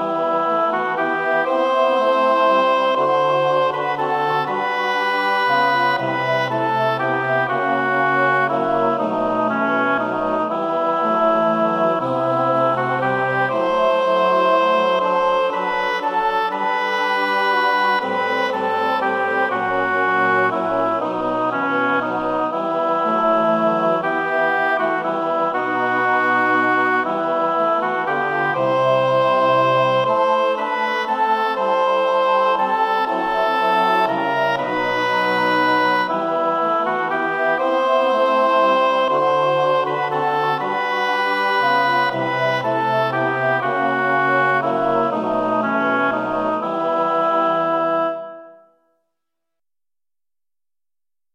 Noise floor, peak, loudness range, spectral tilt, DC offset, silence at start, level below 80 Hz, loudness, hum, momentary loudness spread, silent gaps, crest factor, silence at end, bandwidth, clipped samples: under -90 dBFS; -6 dBFS; 2 LU; -5.5 dB/octave; under 0.1%; 0 s; -58 dBFS; -18 LUFS; none; 4 LU; none; 14 dB; 2.85 s; 15.5 kHz; under 0.1%